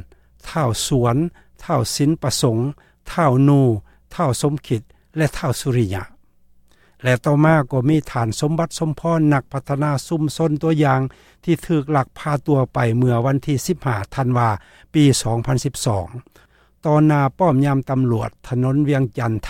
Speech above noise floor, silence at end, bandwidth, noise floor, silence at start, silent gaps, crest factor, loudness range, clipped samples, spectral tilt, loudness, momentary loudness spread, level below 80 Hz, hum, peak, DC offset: 34 dB; 0 s; 16 kHz; -52 dBFS; 0.45 s; none; 16 dB; 2 LU; under 0.1%; -6.5 dB/octave; -19 LUFS; 10 LU; -44 dBFS; none; -2 dBFS; under 0.1%